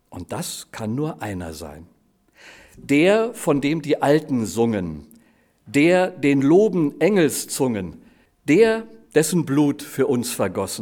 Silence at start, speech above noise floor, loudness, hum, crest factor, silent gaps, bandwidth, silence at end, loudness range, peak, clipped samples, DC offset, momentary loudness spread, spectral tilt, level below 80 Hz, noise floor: 0.1 s; 38 dB; -20 LUFS; none; 18 dB; none; 19.5 kHz; 0 s; 4 LU; -4 dBFS; under 0.1%; under 0.1%; 15 LU; -5.5 dB/octave; -54 dBFS; -58 dBFS